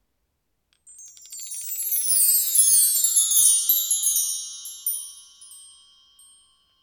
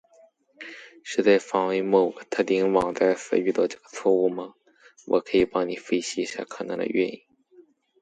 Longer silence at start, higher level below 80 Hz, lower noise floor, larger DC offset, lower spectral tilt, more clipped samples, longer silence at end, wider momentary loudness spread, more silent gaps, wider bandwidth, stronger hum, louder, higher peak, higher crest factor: first, 0.9 s vs 0.6 s; second, -78 dBFS vs -62 dBFS; first, -75 dBFS vs -58 dBFS; neither; second, 7 dB/octave vs -5 dB/octave; neither; first, 1.2 s vs 0.4 s; about the same, 18 LU vs 17 LU; neither; first, over 20 kHz vs 9.4 kHz; neither; first, -18 LUFS vs -24 LUFS; about the same, -4 dBFS vs -6 dBFS; about the same, 20 dB vs 20 dB